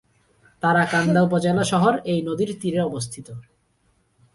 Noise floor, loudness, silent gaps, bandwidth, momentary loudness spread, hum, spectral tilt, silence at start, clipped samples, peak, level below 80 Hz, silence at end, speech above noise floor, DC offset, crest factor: -65 dBFS; -21 LUFS; none; 11.5 kHz; 14 LU; none; -6 dB/octave; 0.65 s; under 0.1%; -6 dBFS; -56 dBFS; 0.95 s; 44 dB; under 0.1%; 18 dB